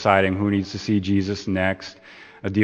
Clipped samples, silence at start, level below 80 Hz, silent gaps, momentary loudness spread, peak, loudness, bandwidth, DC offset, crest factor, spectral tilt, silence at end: under 0.1%; 0 s; -56 dBFS; none; 14 LU; 0 dBFS; -23 LUFS; 8.6 kHz; under 0.1%; 22 dB; -6.5 dB/octave; 0 s